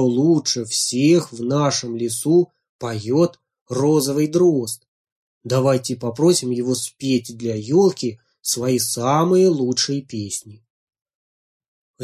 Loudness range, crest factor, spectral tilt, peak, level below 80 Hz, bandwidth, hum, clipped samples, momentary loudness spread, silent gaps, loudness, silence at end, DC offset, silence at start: 2 LU; 16 dB; -5 dB/octave; -4 dBFS; -62 dBFS; 15.5 kHz; none; under 0.1%; 11 LU; 2.69-2.79 s, 3.61-3.66 s, 4.88-5.05 s, 5.12-5.41 s, 10.70-10.87 s, 11.15-11.60 s, 11.68-11.94 s; -19 LUFS; 0 s; under 0.1%; 0 s